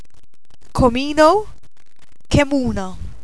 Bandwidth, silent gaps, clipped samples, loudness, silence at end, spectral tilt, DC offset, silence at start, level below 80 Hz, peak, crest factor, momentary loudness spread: 11 kHz; none; under 0.1%; -17 LUFS; 0.15 s; -6 dB/octave; 4%; 0.75 s; -32 dBFS; 0 dBFS; 18 dB; 15 LU